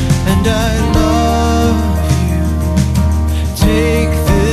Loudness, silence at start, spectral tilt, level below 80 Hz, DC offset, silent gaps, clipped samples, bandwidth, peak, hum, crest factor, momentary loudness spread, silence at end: -13 LUFS; 0 s; -6 dB/octave; -16 dBFS; under 0.1%; none; under 0.1%; 14 kHz; 0 dBFS; none; 12 dB; 3 LU; 0 s